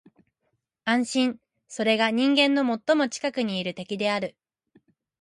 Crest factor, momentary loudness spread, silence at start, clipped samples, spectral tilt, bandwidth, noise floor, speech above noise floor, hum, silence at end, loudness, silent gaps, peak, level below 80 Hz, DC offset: 20 dB; 12 LU; 0.85 s; under 0.1%; -4 dB/octave; 11.5 kHz; -77 dBFS; 53 dB; none; 0.9 s; -24 LUFS; none; -6 dBFS; -74 dBFS; under 0.1%